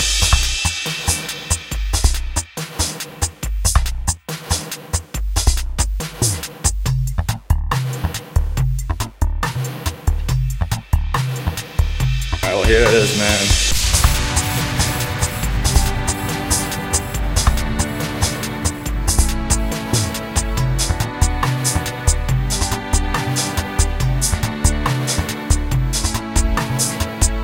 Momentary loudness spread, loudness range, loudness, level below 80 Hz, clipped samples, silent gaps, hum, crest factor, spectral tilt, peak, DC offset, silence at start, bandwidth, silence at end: 8 LU; 6 LU; -19 LUFS; -22 dBFS; under 0.1%; none; none; 18 dB; -3.5 dB/octave; 0 dBFS; under 0.1%; 0 s; 17 kHz; 0 s